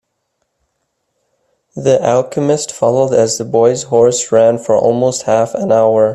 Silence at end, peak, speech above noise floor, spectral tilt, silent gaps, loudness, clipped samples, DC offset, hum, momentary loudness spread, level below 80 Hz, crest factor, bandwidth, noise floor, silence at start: 0 s; 0 dBFS; 57 dB; -5 dB/octave; none; -13 LUFS; under 0.1%; under 0.1%; none; 4 LU; -54 dBFS; 14 dB; 12.5 kHz; -68 dBFS; 1.75 s